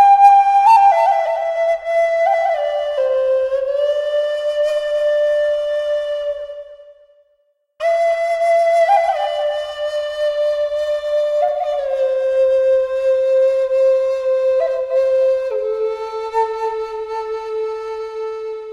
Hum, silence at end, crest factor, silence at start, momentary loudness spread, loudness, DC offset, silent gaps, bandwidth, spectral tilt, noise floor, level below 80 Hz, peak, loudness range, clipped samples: none; 0 s; 16 dB; 0 s; 11 LU; -17 LUFS; under 0.1%; none; 11.5 kHz; -1 dB/octave; -63 dBFS; -56 dBFS; -2 dBFS; 5 LU; under 0.1%